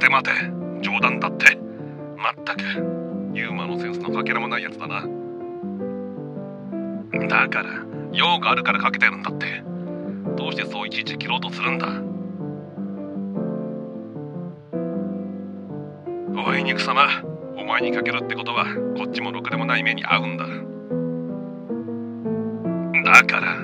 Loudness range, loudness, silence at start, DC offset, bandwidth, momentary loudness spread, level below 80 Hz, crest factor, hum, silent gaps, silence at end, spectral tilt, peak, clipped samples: 8 LU; -22 LUFS; 0 s; under 0.1%; 13 kHz; 15 LU; -68 dBFS; 24 dB; none; none; 0 s; -5 dB/octave; 0 dBFS; under 0.1%